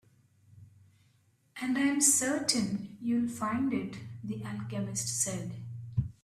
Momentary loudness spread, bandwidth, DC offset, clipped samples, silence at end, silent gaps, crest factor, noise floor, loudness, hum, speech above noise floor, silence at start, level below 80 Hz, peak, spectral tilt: 16 LU; 15.5 kHz; under 0.1%; under 0.1%; 0.1 s; none; 22 dB; -68 dBFS; -31 LUFS; none; 37 dB; 0.5 s; -60 dBFS; -12 dBFS; -3.5 dB/octave